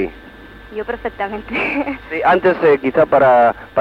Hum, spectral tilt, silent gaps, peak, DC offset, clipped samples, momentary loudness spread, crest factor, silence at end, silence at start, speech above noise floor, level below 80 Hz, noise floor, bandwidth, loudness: none; -7.5 dB/octave; none; -2 dBFS; under 0.1%; under 0.1%; 14 LU; 14 dB; 0 s; 0 s; 23 dB; -44 dBFS; -38 dBFS; 6 kHz; -15 LUFS